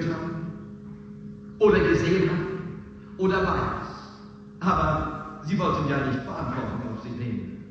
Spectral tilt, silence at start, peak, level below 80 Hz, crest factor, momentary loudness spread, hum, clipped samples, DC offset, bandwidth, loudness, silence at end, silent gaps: -7.5 dB/octave; 0 s; -8 dBFS; -44 dBFS; 18 dB; 20 LU; none; under 0.1%; under 0.1%; 7.8 kHz; -26 LUFS; 0 s; none